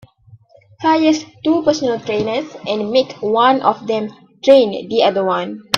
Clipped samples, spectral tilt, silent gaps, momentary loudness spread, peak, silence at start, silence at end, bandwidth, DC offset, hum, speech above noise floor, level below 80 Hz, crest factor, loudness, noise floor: under 0.1%; -4.5 dB/octave; none; 10 LU; 0 dBFS; 0.8 s; 0 s; 12 kHz; under 0.1%; none; 31 dB; -58 dBFS; 16 dB; -16 LUFS; -47 dBFS